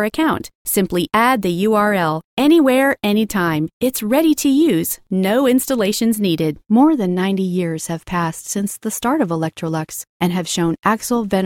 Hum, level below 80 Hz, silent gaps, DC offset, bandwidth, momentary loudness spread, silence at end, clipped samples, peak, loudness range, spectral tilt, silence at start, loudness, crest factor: none; -50 dBFS; 0.55-0.65 s, 2.25-2.37 s, 3.73-3.80 s, 10.09-10.20 s; under 0.1%; 18 kHz; 8 LU; 0 s; under 0.1%; -2 dBFS; 5 LU; -5 dB/octave; 0 s; -17 LUFS; 14 dB